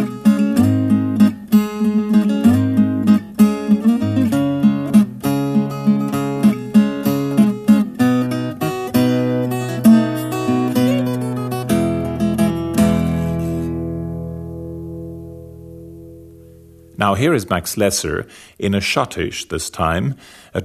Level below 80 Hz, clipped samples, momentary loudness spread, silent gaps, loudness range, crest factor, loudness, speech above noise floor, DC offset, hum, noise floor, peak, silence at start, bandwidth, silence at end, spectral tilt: -42 dBFS; under 0.1%; 14 LU; none; 8 LU; 16 dB; -17 LUFS; 23 dB; under 0.1%; none; -43 dBFS; 0 dBFS; 0 s; 14 kHz; 0 s; -6 dB/octave